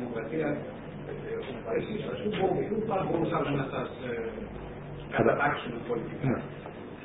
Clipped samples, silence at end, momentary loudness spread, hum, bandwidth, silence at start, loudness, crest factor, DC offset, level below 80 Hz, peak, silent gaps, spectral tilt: under 0.1%; 0 s; 13 LU; none; 3.9 kHz; 0 s; -32 LUFS; 22 dB; under 0.1%; -54 dBFS; -10 dBFS; none; -3.5 dB/octave